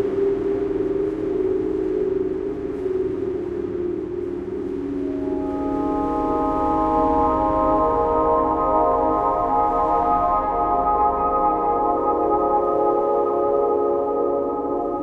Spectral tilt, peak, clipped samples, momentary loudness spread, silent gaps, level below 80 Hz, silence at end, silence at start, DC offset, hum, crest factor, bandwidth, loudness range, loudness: -9 dB/octave; -6 dBFS; under 0.1%; 7 LU; none; -40 dBFS; 0 s; 0 s; under 0.1%; none; 14 dB; 7 kHz; 6 LU; -21 LUFS